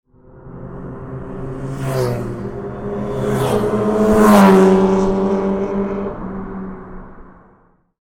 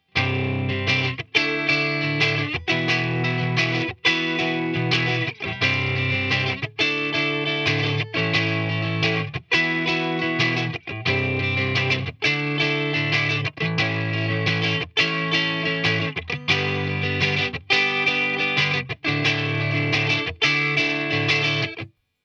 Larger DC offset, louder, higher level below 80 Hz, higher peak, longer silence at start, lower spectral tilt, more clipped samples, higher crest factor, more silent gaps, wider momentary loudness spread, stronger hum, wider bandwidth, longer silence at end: neither; first, -16 LUFS vs -21 LUFS; first, -36 dBFS vs -56 dBFS; first, 0 dBFS vs -4 dBFS; first, 0.35 s vs 0.15 s; first, -7 dB/octave vs -5 dB/octave; neither; about the same, 18 dB vs 18 dB; neither; first, 22 LU vs 4 LU; neither; first, 16.5 kHz vs 9 kHz; first, 0.7 s vs 0.4 s